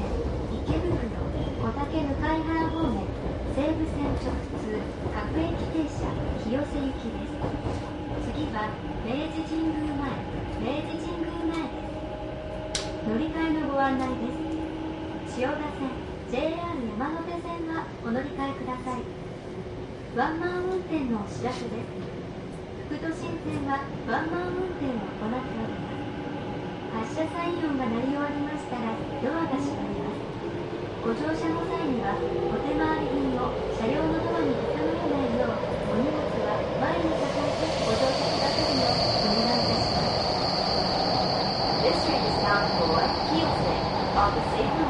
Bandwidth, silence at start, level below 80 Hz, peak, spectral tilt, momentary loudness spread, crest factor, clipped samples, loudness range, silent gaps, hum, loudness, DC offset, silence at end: 11.5 kHz; 0 s; -40 dBFS; -10 dBFS; -6 dB/octave; 10 LU; 18 dB; under 0.1%; 7 LU; none; none; -28 LUFS; under 0.1%; 0 s